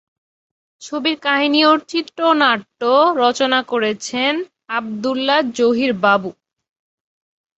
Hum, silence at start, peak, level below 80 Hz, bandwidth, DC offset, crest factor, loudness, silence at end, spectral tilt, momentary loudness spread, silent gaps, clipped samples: none; 0.8 s; -2 dBFS; -66 dBFS; 8.2 kHz; under 0.1%; 16 dB; -17 LUFS; 1.25 s; -3.5 dB/octave; 10 LU; none; under 0.1%